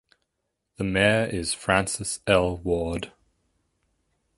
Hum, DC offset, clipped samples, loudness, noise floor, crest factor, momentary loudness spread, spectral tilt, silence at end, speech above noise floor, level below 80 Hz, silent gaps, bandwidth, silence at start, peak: none; under 0.1%; under 0.1%; -24 LUFS; -80 dBFS; 24 dB; 11 LU; -4 dB/octave; 1.3 s; 55 dB; -46 dBFS; none; 11.5 kHz; 0.8 s; -4 dBFS